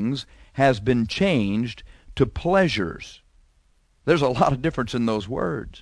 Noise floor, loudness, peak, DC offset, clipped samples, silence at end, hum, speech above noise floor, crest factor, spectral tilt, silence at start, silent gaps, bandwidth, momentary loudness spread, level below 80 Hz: -61 dBFS; -23 LUFS; -4 dBFS; under 0.1%; under 0.1%; 0 s; none; 39 dB; 20 dB; -6.5 dB/octave; 0 s; none; 11 kHz; 13 LU; -42 dBFS